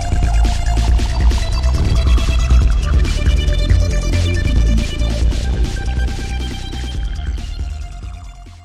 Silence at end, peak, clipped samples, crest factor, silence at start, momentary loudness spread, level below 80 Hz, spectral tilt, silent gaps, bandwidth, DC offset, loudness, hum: 0 s; 0 dBFS; under 0.1%; 14 dB; 0 s; 11 LU; -16 dBFS; -5.5 dB/octave; none; 11 kHz; under 0.1%; -18 LUFS; none